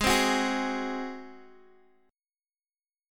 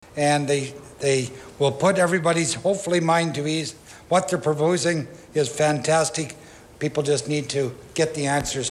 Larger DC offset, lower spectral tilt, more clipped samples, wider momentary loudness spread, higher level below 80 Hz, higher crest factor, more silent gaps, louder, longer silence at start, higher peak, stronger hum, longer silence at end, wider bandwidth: neither; second, -2.5 dB/octave vs -4.5 dB/octave; neither; first, 20 LU vs 9 LU; about the same, -50 dBFS vs -54 dBFS; about the same, 20 dB vs 16 dB; neither; second, -28 LUFS vs -23 LUFS; second, 0 s vs 0.15 s; second, -10 dBFS vs -6 dBFS; neither; first, 1.65 s vs 0 s; first, 17.5 kHz vs 14.5 kHz